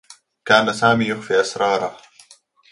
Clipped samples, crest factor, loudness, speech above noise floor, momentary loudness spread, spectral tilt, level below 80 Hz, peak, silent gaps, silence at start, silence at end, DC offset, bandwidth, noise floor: under 0.1%; 20 dB; -18 LUFS; 34 dB; 9 LU; -4 dB/octave; -60 dBFS; 0 dBFS; none; 0.1 s; 0.75 s; under 0.1%; 11.5 kHz; -52 dBFS